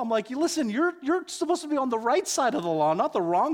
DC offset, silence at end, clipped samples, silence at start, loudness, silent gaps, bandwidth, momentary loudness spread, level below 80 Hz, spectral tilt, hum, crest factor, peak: under 0.1%; 0 s; under 0.1%; 0 s; -26 LUFS; none; 18 kHz; 4 LU; -72 dBFS; -4 dB/octave; none; 14 dB; -12 dBFS